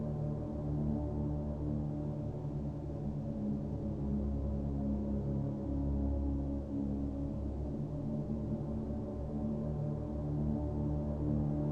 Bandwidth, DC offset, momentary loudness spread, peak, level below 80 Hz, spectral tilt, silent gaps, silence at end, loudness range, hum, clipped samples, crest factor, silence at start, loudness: 5 kHz; under 0.1%; 4 LU; -22 dBFS; -42 dBFS; -11 dB/octave; none; 0 s; 2 LU; none; under 0.1%; 14 dB; 0 s; -37 LUFS